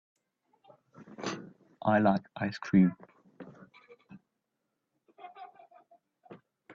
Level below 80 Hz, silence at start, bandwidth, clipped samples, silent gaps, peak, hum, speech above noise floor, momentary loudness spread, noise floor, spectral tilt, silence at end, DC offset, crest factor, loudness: -72 dBFS; 1.2 s; 7.4 kHz; under 0.1%; none; -14 dBFS; none; 57 dB; 27 LU; -84 dBFS; -7.5 dB/octave; 0 s; under 0.1%; 22 dB; -29 LUFS